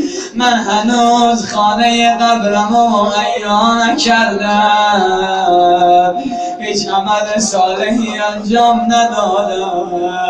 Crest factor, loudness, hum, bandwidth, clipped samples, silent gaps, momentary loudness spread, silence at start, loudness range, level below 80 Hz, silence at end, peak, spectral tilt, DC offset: 12 dB; -12 LUFS; none; 10 kHz; under 0.1%; none; 7 LU; 0 s; 2 LU; -46 dBFS; 0 s; 0 dBFS; -3.5 dB/octave; under 0.1%